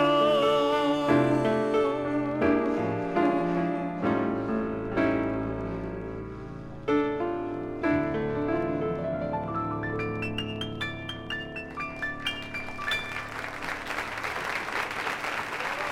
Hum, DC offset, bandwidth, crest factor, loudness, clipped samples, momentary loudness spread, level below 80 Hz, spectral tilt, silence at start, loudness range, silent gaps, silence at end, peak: none; under 0.1%; 15 kHz; 18 dB; -28 LUFS; under 0.1%; 10 LU; -50 dBFS; -6 dB/octave; 0 s; 7 LU; none; 0 s; -10 dBFS